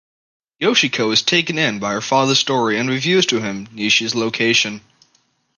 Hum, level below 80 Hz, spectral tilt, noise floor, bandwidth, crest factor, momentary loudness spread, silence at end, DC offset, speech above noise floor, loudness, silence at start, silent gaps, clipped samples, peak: none; -62 dBFS; -3 dB/octave; -62 dBFS; 10.5 kHz; 18 dB; 7 LU; 0.8 s; under 0.1%; 44 dB; -16 LUFS; 0.6 s; none; under 0.1%; 0 dBFS